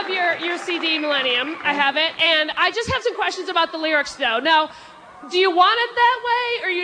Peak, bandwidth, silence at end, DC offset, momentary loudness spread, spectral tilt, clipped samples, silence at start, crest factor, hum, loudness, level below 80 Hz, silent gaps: -4 dBFS; 10.5 kHz; 0 s; under 0.1%; 6 LU; -2.5 dB/octave; under 0.1%; 0 s; 16 dB; none; -19 LUFS; -56 dBFS; none